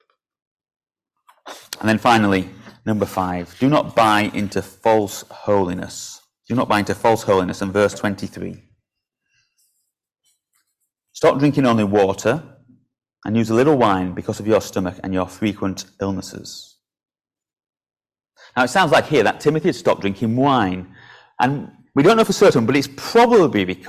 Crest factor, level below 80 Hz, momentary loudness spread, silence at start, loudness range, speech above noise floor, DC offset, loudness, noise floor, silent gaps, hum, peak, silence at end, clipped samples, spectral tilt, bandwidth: 16 dB; -48 dBFS; 14 LU; 1.45 s; 8 LU; 61 dB; under 0.1%; -18 LUFS; -79 dBFS; none; none; -2 dBFS; 0 s; under 0.1%; -5.5 dB/octave; 16 kHz